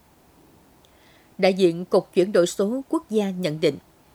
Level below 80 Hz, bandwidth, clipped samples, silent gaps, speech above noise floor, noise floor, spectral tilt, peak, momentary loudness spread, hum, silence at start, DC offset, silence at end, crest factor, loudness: -64 dBFS; 16.5 kHz; under 0.1%; none; 34 dB; -55 dBFS; -5.5 dB/octave; -4 dBFS; 6 LU; none; 1.4 s; under 0.1%; 0.35 s; 20 dB; -22 LUFS